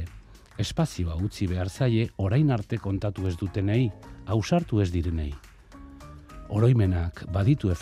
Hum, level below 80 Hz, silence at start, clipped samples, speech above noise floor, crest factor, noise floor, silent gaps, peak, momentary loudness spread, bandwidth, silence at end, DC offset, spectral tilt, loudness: none; -44 dBFS; 0 s; under 0.1%; 23 dB; 16 dB; -48 dBFS; none; -10 dBFS; 19 LU; 12.5 kHz; 0 s; under 0.1%; -7.5 dB/octave; -26 LUFS